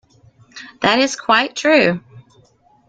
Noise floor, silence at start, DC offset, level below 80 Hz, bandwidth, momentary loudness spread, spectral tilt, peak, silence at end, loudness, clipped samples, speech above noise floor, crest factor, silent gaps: -54 dBFS; 0.55 s; under 0.1%; -58 dBFS; 9.2 kHz; 18 LU; -3.5 dB/octave; -2 dBFS; 0.7 s; -15 LUFS; under 0.1%; 38 dB; 18 dB; none